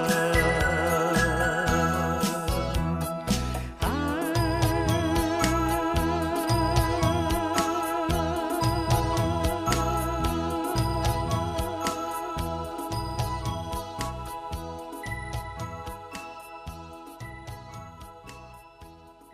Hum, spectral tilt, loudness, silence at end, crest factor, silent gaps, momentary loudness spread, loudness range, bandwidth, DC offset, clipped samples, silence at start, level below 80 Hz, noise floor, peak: none; -5 dB/octave; -27 LUFS; 0 s; 20 dB; none; 17 LU; 13 LU; 15.5 kHz; under 0.1%; under 0.1%; 0 s; -36 dBFS; -49 dBFS; -8 dBFS